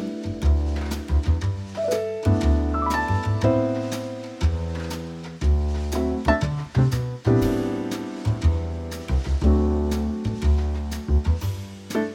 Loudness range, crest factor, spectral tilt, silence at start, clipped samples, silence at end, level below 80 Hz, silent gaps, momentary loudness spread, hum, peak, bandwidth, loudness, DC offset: 2 LU; 18 dB; -7 dB/octave; 0 s; under 0.1%; 0 s; -26 dBFS; none; 9 LU; none; -4 dBFS; 15 kHz; -24 LUFS; under 0.1%